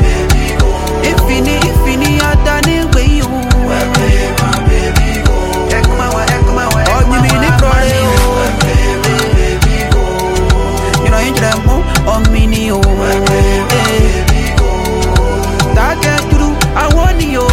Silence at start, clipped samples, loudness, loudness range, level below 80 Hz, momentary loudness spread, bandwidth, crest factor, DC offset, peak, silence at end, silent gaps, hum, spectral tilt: 0 s; under 0.1%; -11 LUFS; 1 LU; -14 dBFS; 3 LU; 16.5 kHz; 10 dB; under 0.1%; 0 dBFS; 0 s; none; none; -5 dB/octave